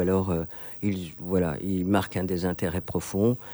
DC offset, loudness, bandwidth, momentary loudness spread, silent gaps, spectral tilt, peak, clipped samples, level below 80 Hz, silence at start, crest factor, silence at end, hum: under 0.1%; -28 LUFS; over 20 kHz; 5 LU; none; -7 dB/octave; -10 dBFS; under 0.1%; -50 dBFS; 0 s; 16 dB; 0 s; none